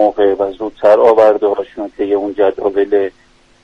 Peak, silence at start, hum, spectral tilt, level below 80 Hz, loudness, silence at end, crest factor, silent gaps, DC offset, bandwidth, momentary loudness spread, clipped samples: 0 dBFS; 0 s; none; -6.5 dB/octave; -50 dBFS; -13 LUFS; 0.55 s; 14 dB; none; under 0.1%; 6.8 kHz; 12 LU; under 0.1%